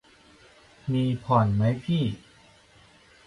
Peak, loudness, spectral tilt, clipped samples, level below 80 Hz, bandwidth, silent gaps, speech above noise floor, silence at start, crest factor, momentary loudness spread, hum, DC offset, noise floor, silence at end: -6 dBFS; -25 LUFS; -8.5 dB/octave; under 0.1%; -54 dBFS; 11 kHz; none; 32 dB; 0.85 s; 22 dB; 12 LU; none; under 0.1%; -56 dBFS; 1.1 s